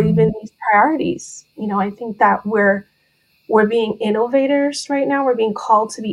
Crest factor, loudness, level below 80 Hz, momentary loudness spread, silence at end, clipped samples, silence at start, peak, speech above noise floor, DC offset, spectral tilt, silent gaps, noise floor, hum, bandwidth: 16 dB; -17 LUFS; -52 dBFS; 9 LU; 0 s; under 0.1%; 0 s; 0 dBFS; 44 dB; under 0.1%; -6 dB/octave; none; -61 dBFS; none; 11.5 kHz